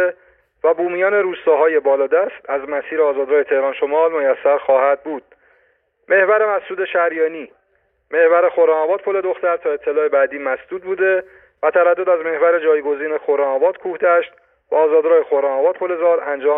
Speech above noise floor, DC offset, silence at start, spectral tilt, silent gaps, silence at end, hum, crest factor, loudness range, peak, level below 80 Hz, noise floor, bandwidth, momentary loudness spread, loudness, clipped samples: 47 dB; under 0.1%; 0 s; -8.5 dB/octave; none; 0 s; none; 14 dB; 1 LU; -4 dBFS; -66 dBFS; -63 dBFS; 3.8 kHz; 8 LU; -17 LUFS; under 0.1%